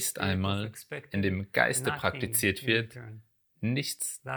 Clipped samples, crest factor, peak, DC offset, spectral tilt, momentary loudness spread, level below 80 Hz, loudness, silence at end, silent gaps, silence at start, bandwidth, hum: under 0.1%; 22 dB; -8 dBFS; under 0.1%; -4 dB/octave; 13 LU; -62 dBFS; -29 LUFS; 0 s; none; 0 s; over 20 kHz; none